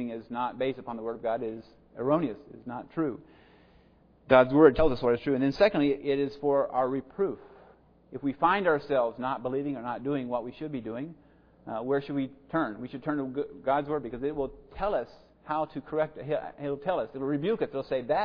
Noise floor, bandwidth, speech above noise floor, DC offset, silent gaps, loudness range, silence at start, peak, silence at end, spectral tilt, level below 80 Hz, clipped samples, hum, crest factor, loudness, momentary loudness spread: -60 dBFS; 5.4 kHz; 32 dB; under 0.1%; none; 9 LU; 0 s; -8 dBFS; 0 s; -8.5 dB/octave; -52 dBFS; under 0.1%; none; 22 dB; -29 LUFS; 13 LU